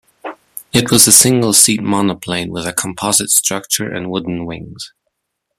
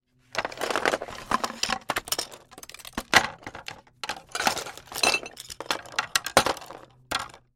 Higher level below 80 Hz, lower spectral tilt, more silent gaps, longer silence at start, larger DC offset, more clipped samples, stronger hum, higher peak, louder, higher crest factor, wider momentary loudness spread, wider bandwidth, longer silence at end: first, -48 dBFS vs -56 dBFS; first, -2.5 dB/octave vs -1 dB/octave; neither; about the same, 0.25 s vs 0.35 s; neither; first, 0.2% vs under 0.1%; neither; about the same, 0 dBFS vs -2 dBFS; first, -12 LUFS vs -27 LUFS; second, 16 dB vs 28 dB; first, 24 LU vs 17 LU; first, over 20 kHz vs 17 kHz; first, 0.7 s vs 0.2 s